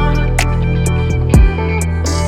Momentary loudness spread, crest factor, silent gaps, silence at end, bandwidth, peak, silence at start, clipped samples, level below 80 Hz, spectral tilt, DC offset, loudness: 5 LU; 12 dB; none; 0 s; 14 kHz; 0 dBFS; 0 s; under 0.1%; -16 dBFS; -6 dB/octave; under 0.1%; -14 LUFS